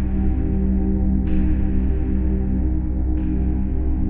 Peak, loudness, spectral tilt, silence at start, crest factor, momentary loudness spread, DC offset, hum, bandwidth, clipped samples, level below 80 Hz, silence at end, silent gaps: -6 dBFS; -22 LUFS; -13.5 dB/octave; 0 s; 12 dB; 2 LU; under 0.1%; none; 3 kHz; under 0.1%; -20 dBFS; 0 s; none